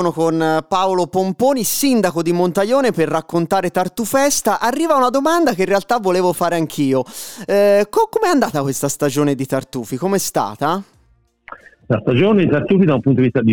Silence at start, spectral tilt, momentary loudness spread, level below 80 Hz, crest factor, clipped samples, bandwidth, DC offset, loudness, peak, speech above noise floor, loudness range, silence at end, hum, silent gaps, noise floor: 0 s; -5 dB/octave; 6 LU; -54 dBFS; 12 dB; under 0.1%; over 20 kHz; 0.7%; -16 LUFS; -4 dBFS; 41 dB; 3 LU; 0 s; none; none; -57 dBFS